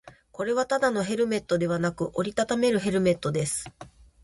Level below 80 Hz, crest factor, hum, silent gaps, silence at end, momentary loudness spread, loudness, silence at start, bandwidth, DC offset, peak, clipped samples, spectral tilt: -56 dBFS; 16 dB; none; none; 0.35 s; 7 LU; -26 LUFS; 0.05 s; 11.5 kHz; under 0.1%; -10 dBFS; under 0.1%; -5 dB/octave